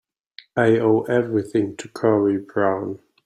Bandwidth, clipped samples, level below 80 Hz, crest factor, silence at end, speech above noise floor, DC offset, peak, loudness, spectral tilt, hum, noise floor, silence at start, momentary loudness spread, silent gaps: 11 kHz; under 0.1%; -62 dBFS; 18 dB; 0.3 s; 29 dB; under 0.1%; -4 dBFS; -21 LUFS; -7.5 dB/octave; none; -49 dBFS; 0.55 s; 10 LU; none